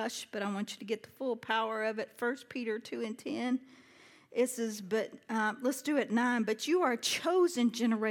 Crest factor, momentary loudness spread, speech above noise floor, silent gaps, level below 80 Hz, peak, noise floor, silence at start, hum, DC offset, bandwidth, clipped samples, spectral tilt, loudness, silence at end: 18 dB; 9 LU; 26 dB; none; -88 dBFS; -16 dBFS; -59 dBFS; 0 s; none; under 0.1%; 18 kHz; under 0.1%; -3.5 dB/octave; -33 LUFS; 0 s